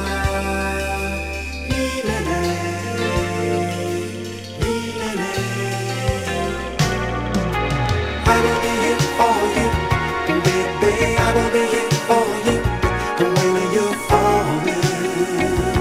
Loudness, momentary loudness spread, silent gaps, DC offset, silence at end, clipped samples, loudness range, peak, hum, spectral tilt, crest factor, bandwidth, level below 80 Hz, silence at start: -20 LUFS; 7 LU; none; under 0.1%; 0 s; under 0.1%; 5 LU; 0 dBFS; none; -5 dB/octave; 18 dB; 16.5 kHz; -32 dBFS; 0 s